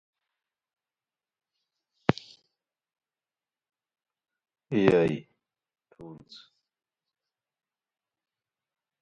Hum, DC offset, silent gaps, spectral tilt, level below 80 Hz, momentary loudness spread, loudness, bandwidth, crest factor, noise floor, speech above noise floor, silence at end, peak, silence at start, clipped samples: none; under 0.1%; none; -7.5 dB/octave; -66 dBFS; 25 LU; -27 LUFS; 8.8 kHz; 32 dB; under -90 dBFS; over 64 dB; 2.85 s; -2 dBFS; 2.1 s; under 0.1%